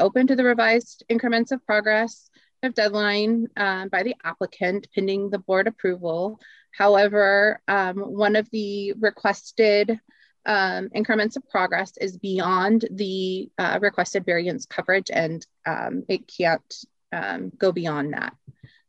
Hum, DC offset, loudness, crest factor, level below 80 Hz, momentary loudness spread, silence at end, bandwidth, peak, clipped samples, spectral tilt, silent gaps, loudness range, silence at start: none; under 0.1%; -23 LUFS; 16 dB; -72 dBFS; 10 LU; 0.35 s; 8.2 kHz; -6 dBFS; under 0.1%; -5 dB/octave; none; 4 LU; 0 s